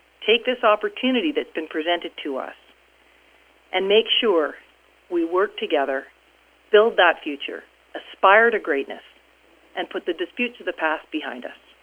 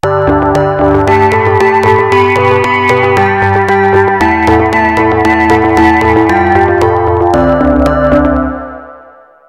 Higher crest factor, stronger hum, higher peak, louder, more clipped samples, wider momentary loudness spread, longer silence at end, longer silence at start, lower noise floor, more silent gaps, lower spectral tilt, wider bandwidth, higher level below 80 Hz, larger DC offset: first, 22 dB vs 8 dB; neither; about the same, 0 dBFS vs 0 dBFS; second, -21 LUFS vs -8 LUFS; second, under 0.1% vs 0.8%; first, 17 LU vs 2 LU; second, 0.3 s vs 0.5 s; first, 0.2 s vs 0.05 s; first, -57 dBFS vs -37 dBFS; neither; second, -4.5 dB/octave vs -7 dB/octave; second, 4.9 kHz vs 13.5 kHz; second, -66 dBFS vs -26 dBFS; neither